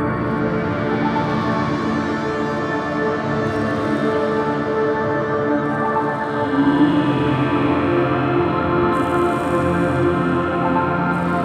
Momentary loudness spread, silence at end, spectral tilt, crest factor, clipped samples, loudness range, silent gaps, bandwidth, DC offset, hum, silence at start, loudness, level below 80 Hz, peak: 3 LU; 0 s; -7.5 dB/octave; 14 dB; under 0.1%; 3 LU; none; 10.5 kHz; under 0.1%; none; 0 s; -19 LUFS; -44 dBFS; -4 dBFS